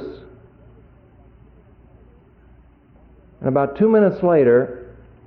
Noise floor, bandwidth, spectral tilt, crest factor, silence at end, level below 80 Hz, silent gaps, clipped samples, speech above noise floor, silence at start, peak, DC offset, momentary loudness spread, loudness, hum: -50 dBFS; 4.5 kHz; -11.5 dB/octave; 16 dB; 0.35 s; -52 dBFS; none; under 0.1%; 34 dB; 0 s; -6 dBFS; under 0.1%; 22 LU; -17 LUFS; none